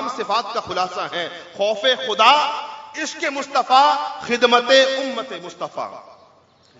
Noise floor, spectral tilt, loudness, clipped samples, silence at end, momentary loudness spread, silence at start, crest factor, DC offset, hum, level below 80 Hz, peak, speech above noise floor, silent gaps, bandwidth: -54 dBFS; -2 dB/octave; -18 LUFS; under 0.1%; 0.65 s; 16 LU; 0 s; 20 dB; under 0.1%; none; -68 dBFS; 0 dBFS; 35 dB; none; 7.8 kHz